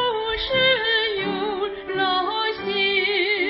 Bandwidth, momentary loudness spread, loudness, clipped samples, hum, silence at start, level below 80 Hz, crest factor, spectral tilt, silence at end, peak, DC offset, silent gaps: 5.8 kHz; 7 LU; -21 LUFS; under 0.1%; none; 0 s; -48 dBFS; 14 dB; -8 dB/octave; 0 s; -8 dBFS; under 0.1%; none